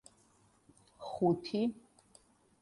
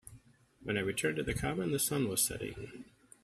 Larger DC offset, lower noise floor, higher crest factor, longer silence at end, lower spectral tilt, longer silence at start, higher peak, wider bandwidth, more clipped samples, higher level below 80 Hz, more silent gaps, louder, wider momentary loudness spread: neither; first, -68 dBFS vs -61 dBFS; about the same, 20 dB vs 20 dB; first, 0.8 s vs 0.4 s; first, -7.5 dB/octave vs -3.5 dB/octave; first, 1 s vs 0.05 s; about the same, -18 dBFS vs -16 dBFS; second, 11.5 kHz vs 15.5 kHz; neither; second, -72 dBFS vs -56 dBFS; neither; about the same, -35 LUFS vs -34 LUFS; about the same, 18 LU vs 17 LU